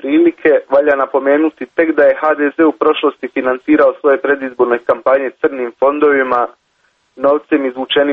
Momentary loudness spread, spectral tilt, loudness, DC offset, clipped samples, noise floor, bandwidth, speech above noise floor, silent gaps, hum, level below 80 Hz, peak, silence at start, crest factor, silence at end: 6 LU; -6.5 dB/octave; -13 LUFS; under 0.1%; under 0.1%; -59 dBFS; 4.5 kHz; 46 dB; none; none; -56 dBFS; 0 dBFS; 0.05 s; 12 dB; 0 s